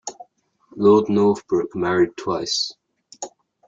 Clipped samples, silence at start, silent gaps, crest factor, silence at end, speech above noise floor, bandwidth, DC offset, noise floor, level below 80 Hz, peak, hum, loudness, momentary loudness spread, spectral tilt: under 0.1%; 0.05 s; none; 18 dB; 0.4 s; 39 dB; 7.8 kHz; under 0.1%; -58 dBFS; -60 dBFS; -4 dBFS; none; -20 LUFS; 20 LU; -5 dB/octave